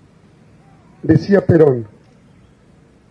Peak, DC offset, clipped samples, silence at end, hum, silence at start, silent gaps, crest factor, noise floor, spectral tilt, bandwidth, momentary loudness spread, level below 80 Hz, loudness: 0 dBFS; under 0.1%; under 0.1%; 1.25 s; none; 1.05 s; none; 18 dB; -49 dBFS; -9.5 dB/octave; 6.8 kHz; 15 LU; -46 dBFS; -14 LUFS